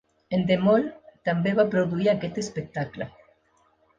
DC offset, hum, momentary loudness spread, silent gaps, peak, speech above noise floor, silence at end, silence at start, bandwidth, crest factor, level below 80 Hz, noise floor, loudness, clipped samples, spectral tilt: under 0.1%; none; 12 LU; none; -8 dBFS; 41 dB; 0.9 s; 0.3 s; 9.2 kHz; 18 dB; -60 dBFS; -65 dBFS; -25 LUFS; under 0.1%; -6.5 dB/octave